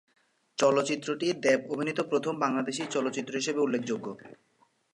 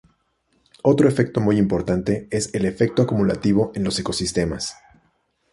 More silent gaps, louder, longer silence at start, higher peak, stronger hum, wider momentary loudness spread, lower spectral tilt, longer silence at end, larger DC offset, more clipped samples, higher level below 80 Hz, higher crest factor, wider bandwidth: neither; second, -29 LUFS vs -21 LUFS; second, 0.6 s vs 0.85 s; second, -12 dBFS vs -4 dBFS; neither; first, 9 LU vs 6 LU; second, -4 dB/octave vs -6 dB/octave; second, 0.6 s vs 0.8 s; neither; neither; second, -80 dBFS vs -44 dBFS; about the same, 18 dB vs 18 dB; about the same, 11.5 kHz vs 11.5 kHz